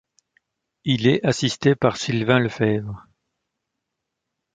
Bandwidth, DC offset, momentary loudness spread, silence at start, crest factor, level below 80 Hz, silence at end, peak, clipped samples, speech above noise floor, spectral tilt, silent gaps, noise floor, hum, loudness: 9.4 kHz; under 0.1%; 11 LU; 0.85 s; 22 dB; -56 dBFS; 1.55 s; -2 dBFS; under 0.1%; 61 dB; -5.5 dB/octave; none; -81 dBFS; none; -21 LUFS